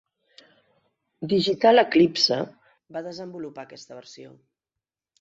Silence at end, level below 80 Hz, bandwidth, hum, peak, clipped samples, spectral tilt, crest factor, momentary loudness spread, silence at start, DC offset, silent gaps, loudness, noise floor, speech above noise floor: 0.9 s; -68 dBFS; 7.8 kHz; none; -4 dBFS; under 0.1%; -5 dB/octave; 20 dB; 25 LU; 1.2 s; under 0.1%; none; -20 LUFS; -88 dBFS; 65 dB